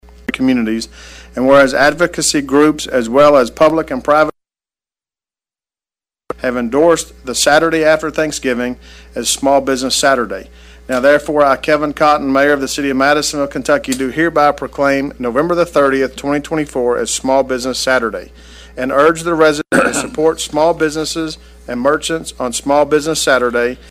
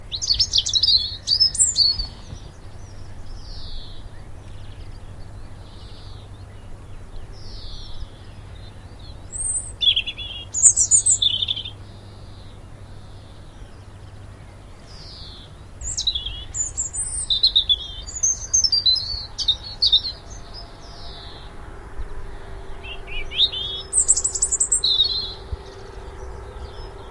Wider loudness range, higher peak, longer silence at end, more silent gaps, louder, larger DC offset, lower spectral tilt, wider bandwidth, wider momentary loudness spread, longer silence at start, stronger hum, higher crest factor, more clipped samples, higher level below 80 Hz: second, 4 LU vs 22 LU; about the same, 0 dBFS vs 0 dBFS; first, 0.15 s vs 0 s; neither; first, -14 LUFS vs -18 LUFS; neither; first, -3.5 dB/octave vs 0.5 dB/octave; first, 15.5 kHz vs 12 kHz; second, 9 LU vs 26 LU; first, 0.3 s vs 0 s; neither; second, 14 dB vs 24 dB; neither; about the same, -40 dBFS vs -38 dBFS